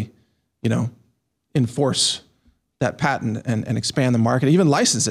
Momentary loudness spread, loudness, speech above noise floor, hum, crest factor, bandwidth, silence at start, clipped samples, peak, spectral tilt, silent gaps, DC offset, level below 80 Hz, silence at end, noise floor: 10 LU; -20 LUFS; 48 dB; none; 14 dB; 14 kHz; 0 s; under 0.1%; -6 dBFS; -4.5 dB/octave; none; under 0.1%; -58 dBFS; 0 s; -67 dBFS